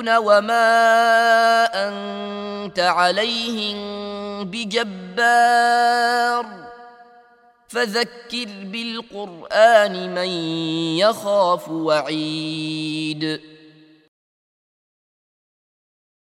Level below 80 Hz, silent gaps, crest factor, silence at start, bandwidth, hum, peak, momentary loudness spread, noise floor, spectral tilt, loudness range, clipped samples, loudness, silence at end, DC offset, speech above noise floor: -66 dBFS; none; 20 dB; 0 s; 14.5 kHz; none; -2 dBFS; 14 LU; -53 dBFS; -3.5 dB/octave; 10 LU; under 0.1%; -19 LUFS; 2.8 s; under 0.1%; 34 dB